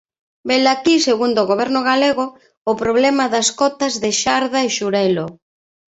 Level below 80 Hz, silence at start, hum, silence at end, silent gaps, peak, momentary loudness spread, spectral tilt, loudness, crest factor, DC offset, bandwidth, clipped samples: -56 dBFS; 0.45 s; none; 0.65 s; 2.57-2.65 s; -2 dBFS; 8 LU; -3 dB/octave; -17 LUFS; 16 dB; under 0.1%; 8.4 kHz; under 0.1%